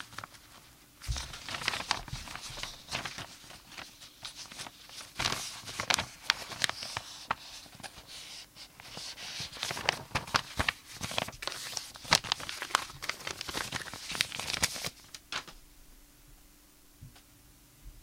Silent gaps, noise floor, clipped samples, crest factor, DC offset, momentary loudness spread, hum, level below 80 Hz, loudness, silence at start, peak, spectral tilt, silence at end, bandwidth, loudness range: none; -59 dBFS; under 0.1%; 36 dB; under 0.1%; 17 LU; none; -54 dBFS; -35 LUFS; 0 s; -2 dBFS; -1.5 dB/octave; 0 s; 16.5 kHz; 7 LU